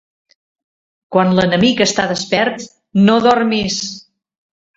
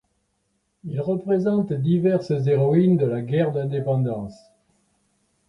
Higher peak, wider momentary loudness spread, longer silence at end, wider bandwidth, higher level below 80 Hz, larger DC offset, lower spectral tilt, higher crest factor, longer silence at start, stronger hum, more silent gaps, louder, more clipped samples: first, 0 dBFS vs -8 dBFS; about the same, 10 LU vs 12 LU; second, 0.75 s vs 1.15 s; second, 8 kHz vs 9.6 kHz; first, -52 dBFS vs -60 dBFS; neither; second, -4.5 dB/octave vs -10 dB/octave; about the same, 16 dB vs 16 dB; first, 1.1 s vs 0.85 s; neither; neither; first, -14 LUFS vs -22 LUFS; neither